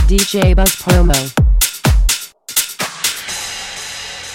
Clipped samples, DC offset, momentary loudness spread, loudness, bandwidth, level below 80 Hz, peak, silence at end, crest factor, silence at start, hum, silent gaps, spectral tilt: under 0.1%; under 0.1%; 12 LU; -15 LUFS; 17 kHz; -16 dBFS; 0 dBFS; 0 s; 14 dB; 0 s; none; none; -3.5 dB/octave